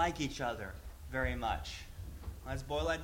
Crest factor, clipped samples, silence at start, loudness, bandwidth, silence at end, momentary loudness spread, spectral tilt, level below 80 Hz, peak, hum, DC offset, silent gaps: 20 dB; under 0.1%; 0 s; -39 LUFS; 16.5 kHz; 0 s; 12 LU; -5 dB/octave; -46 dBFS; -18 dBFS; none; under 0.1%; none